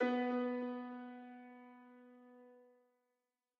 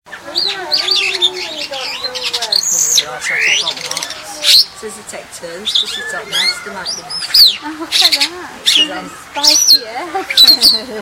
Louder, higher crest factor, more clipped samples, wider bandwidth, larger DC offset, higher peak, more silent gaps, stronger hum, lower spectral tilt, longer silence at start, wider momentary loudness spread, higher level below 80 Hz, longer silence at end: second, -41 LUFS vs -11 LUFS; about the same, 18 dB vs 14 dB; second, under 0.1% vs 0.1%; second, 5.8 kHz vs over 20 kHz; neither; second, -26 dBFS vs 0 dBFS; neither; neither; first, -2.5 dB/octave vs 1.5 dB/octave; about the same, 0 s vs 0.05 s; first, 24 LU vs 15 LU; second, under -90 dBFS vs -54 dBFS; first, 1 s vs 0 s